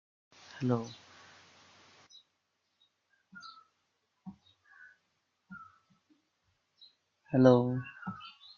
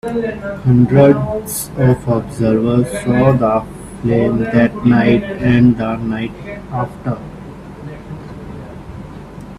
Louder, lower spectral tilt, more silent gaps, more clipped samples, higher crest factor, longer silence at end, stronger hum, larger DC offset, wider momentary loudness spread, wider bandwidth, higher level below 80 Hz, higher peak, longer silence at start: second, -30 LUFS vs -15 LUFS; about the same, -8 dB/octave vs -7.5 dB/octave; neither; neither; first, 28 dB vs 16 dB; first, 0.3 s vs 0 s; neither; neither; first, 29 LU vs 20 LU; second, 7 kHz vs 14.5 kHz; second, -76 dBFS vs -38 dBFS; second, -8 dBFS vs 0 dBFS; first, 0.55 s vs 0.05 s